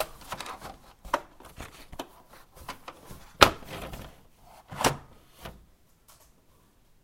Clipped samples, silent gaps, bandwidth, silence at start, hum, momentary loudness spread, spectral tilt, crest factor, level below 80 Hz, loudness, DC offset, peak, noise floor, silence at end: under 0.1%; none; 16 kHz; 0 s; none; 26 LU; -3 dB/octave; 34 dB; -50 dBFS; -27 LUFS; under 0.1%; 0 dBFS; -61 dBFS; 1.5 s